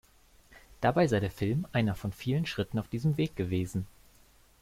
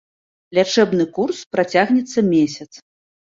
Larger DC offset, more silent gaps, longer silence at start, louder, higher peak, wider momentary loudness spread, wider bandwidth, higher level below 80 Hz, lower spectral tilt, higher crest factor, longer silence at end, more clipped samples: neither; second, none vs 1.46-1.51 s; about the same, 0.5 s vs 0.5 s; second, -31 LUFS vs -18 LUFS; second, -14 dBFS vs -2 dBFS; about the same, 8 LU vs 6 LU; first, 16 kHz vs 7.8 kHz; first, -54 dBFS vs -62 dBFS; first, -7 dB/octave vs -5 dB/octave; about the same, 18 dB vs 18 dB; about the same, 0.7 s vs 0.7 s; neither